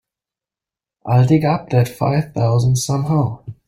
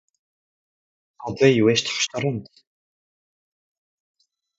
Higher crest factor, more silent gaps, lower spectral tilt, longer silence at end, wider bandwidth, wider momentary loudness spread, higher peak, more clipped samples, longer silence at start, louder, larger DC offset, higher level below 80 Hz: second, 16 dB vs 24 dB; neither; first, -7 dB/octave vs -4.5 dB/octave; second, 0.15 s vs 2.15 s; first, 15.5 kHz vs 8 kHz; second, 5 LU vs 17 LU; about the same, -2 dBFS vs -2 dBFS; neither; second, 1.05 s vs 1.2 s; first, -17 LUFS vs -20 LUFS; neither; first, -48 dBFS vs -62 dBFS